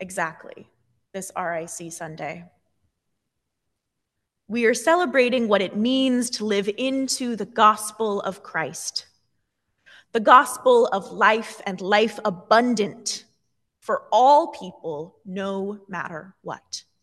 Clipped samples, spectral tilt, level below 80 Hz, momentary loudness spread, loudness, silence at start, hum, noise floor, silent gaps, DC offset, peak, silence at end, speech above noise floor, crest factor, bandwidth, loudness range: under 0.1%; -3.5 dB/octave; -74 dBFS; 17 LU; -21 LUFS; 0 s; none; -80 dBFS; none; under 0.1%; 0 dBFS; 0.2 s; 58 dB; 22 dB; 12.5 kHz; 13 LU